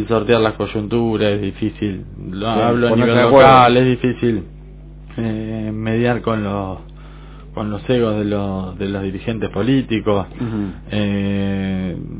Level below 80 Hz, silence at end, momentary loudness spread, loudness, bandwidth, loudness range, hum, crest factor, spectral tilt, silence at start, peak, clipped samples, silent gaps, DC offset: -36 dBFS; 0 s; 13 LU; -17 LUFS; 4 kHz; 8 LU; none; 18 dB; -11 dB/octave; 0 s; 0 dBFS; under 0.1%; none; under 0.1%